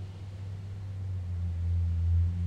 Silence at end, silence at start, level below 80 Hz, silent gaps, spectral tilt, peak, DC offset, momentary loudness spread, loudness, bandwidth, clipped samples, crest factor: 0 s; 0 s; -38 dBFS; none; -8.5 dB/octave; -20 dBFS; under 0.1%; 12 LU; -33 LUFS; 4.5 kHz; under 0.1%; 12 dB